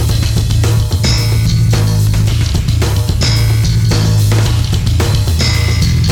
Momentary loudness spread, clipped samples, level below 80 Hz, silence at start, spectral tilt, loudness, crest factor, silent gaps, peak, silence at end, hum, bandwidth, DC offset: 2 LU; under 0.1%; -18 dBFS; 0 s; -5 dB/octave; -12 LUFS; 8 dB; none; -4 dBFS; 0 s; none; 17 kHz; under 0.1%